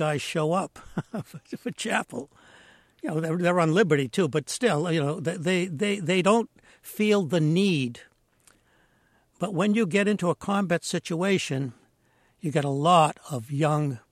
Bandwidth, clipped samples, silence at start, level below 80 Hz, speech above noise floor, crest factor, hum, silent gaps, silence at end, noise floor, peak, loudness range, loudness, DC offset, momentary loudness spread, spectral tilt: 15 kHz; under 0.1%; 0 s; -66 dBFS; 40 dB; 20 dB; none; none; 0.15 s; -65 dBFS; -6 dBFS; 3 LU; -25 LUFS; under 0.1%; 14 LU; -5.5 dB/octave